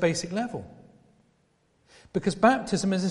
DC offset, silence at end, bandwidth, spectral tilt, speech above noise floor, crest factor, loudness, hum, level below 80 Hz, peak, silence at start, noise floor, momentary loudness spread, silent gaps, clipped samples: under 0.1%; 0 s; 11.5 kHz; -5 dB/octave; 42 dB; 22 dB; -26 LUFS; none; -58 dBFS; -6 dBFS; 0 s; -68 dBFS; 15 LU; none; under 0.1%